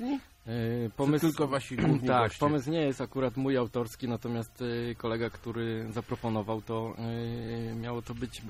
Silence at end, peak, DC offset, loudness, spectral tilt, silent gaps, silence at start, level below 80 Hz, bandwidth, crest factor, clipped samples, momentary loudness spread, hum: 0 s; -12 dBFS; under 0.1%; -32 LUFS; -7 dB/octave; none; 0 s; -54 dBFS; 15.5 kHz; 18 dB; under 0.1%; 9 LU; none